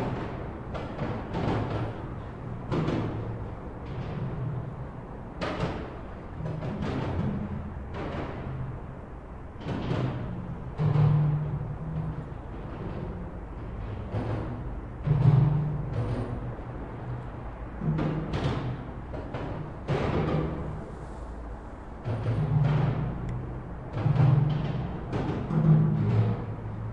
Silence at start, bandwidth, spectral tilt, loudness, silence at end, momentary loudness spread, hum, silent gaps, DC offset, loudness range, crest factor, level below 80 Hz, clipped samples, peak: 0 s; 6.4 kHz; -9 dB/octave; -30 LUFS; 0 s; 16 LU; none; none; under 0.1%; 7 LU; 20 dB; -42 dBFS; under 0.1%; -10 dBFS